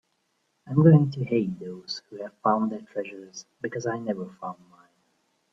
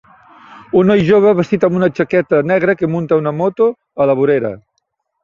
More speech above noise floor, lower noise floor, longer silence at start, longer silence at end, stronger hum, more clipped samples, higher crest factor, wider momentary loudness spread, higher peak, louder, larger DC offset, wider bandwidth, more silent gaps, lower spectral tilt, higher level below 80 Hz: second, 48 dB vs 56 dB; first, -73 dBFS vs -69 dBFS; first, 0.65 s vs 0.5 s; first, 1 s vs 0.65 s; neither; neither; first, 20 dB vs 14 dB; first, 21 LU vs 7 LU; second, -6 dBFS vs 0 dBFS; second, -25 LUFS vs -14 LUFS; neither; about the same, 7.2 kHz vs 7.2 kHz; neither; about the same, -8 dB/octave vs -8.5 dB/octave; second, -66 dBFS vs -52 dBFS